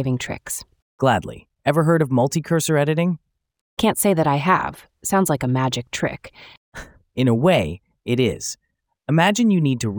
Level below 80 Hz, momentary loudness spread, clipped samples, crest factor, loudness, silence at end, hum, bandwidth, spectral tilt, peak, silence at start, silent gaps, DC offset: -52 dBFS; 16 LU; under 0.1%; 18 dB; -20 LUFS; 0 s; none; over 20 kHz; -5.5 dB/octave; -2 dBFS; 0 s; 0.82-0.98 s, 3.61-3.77 s, 6.57-6.72 s; under 0.1%